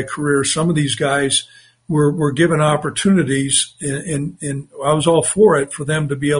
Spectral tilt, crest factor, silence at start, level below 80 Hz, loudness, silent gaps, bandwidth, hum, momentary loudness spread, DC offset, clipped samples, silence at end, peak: -4.5 dB/octave; 16 dB; 0 s; -50 dBFS; -17 LUFS; none; 11 kHz; none; 9 LU; under 0.1%; under 0.1%; 0 s; -2 dBFS